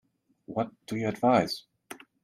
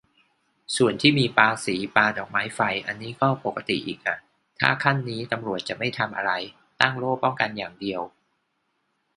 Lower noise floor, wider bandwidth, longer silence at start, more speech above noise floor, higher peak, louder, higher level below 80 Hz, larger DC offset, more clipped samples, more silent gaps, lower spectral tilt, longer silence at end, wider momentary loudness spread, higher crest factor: second, -49 dBFS vs -73 dBFS; first, 15.5 kHz vs 11.5 kHz; second, 0.5 s vs 0.7 s; second, 22 dB vs 49 dB; second, -10 dBFS vs 0 dBFS; second, -29 LUFS vs -24 LUFS; second, -68 dBFS vs -62 dBFS; neither; neither; neither; first, -6 dB/octave vs -4.5 dB/octave; second, 0.25 s vs 1.1 s; first, 23 LU vs 11 LU; second, 20 dB vs 26 dB